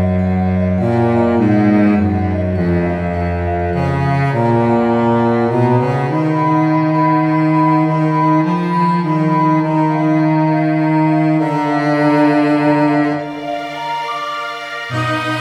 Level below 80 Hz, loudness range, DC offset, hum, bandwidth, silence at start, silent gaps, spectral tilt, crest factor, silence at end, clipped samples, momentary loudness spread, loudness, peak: -42 dBFS; 2 LU; under 0.1%; none; 9.6 kHz; 0 s; none; -8.5 dB/octave; 12 dB; 0 s; under 0.1%; 8 LU; -15 LUFS; -2 dBFS